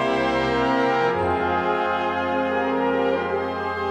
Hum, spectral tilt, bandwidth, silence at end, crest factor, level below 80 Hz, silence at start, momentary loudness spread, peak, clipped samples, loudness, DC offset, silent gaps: none; -6 dB/octave; 11 kHz; 0 s; 14 dB; -48 dBFS; 0 s; 4 LU; -8 dBFS; under 0.1%; -22 LUFS; under 0.1%; none